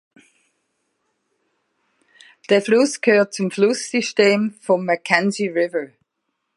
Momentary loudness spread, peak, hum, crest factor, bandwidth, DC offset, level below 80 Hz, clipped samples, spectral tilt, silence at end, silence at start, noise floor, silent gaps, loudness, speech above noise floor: 6 LU; 0 dBFS; none; 20 dB; 11.5 kHz; under 0.1%; -74 dBFS; under 0.1%; -4.5 dB/octave; 0.7 s; 2.5 s; -76 dBFS; none; -18 LUFS; 57 dB